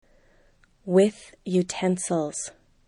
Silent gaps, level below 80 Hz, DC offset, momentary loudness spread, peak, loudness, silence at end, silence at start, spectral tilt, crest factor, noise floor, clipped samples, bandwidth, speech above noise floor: none; -62 dBFS; under 0.1%; 16 LU; -8 dBFS; -25 LUFS; 0.4 s; 0.85 s; -5.5 dB/octave; 18 dB; -60 dBFS; under 0.1%; 11.5 kHz; 35 dB